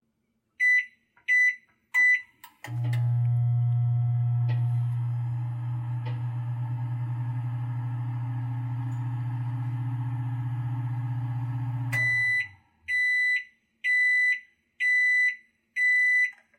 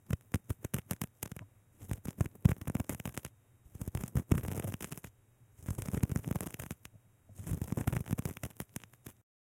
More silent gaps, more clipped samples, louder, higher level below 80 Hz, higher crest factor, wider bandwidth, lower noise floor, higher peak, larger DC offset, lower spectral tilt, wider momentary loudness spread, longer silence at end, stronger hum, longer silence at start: neither; neither; first, -26 LUFS vs -38 LUFS; second, -64 dBFS vs -50 dBFS; second, 12 dB vs 28 dB; second, 10.5 kHz vs 17 kHz; first, -75 dBFS vs -64 dBFS; second, -16 dBFS vs -10 dBFS; neither; about the same, -5.5 dB/octave vs -6.5 dB/octave; second, 11 LU vs 20 LU; second, 0.25 s vs 0.4 s; neither; first, 0.6 s vs 0.1 s